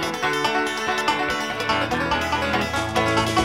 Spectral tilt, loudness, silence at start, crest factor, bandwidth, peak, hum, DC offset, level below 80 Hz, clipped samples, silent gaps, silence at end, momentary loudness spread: -4 dB/octave; -22 LUFS; 0 s; 16 dB; 16.5 kHz; -6 dBFS; none; 0.2%; -42 dBFS; under 0.1%; none; 0 s; 2 LU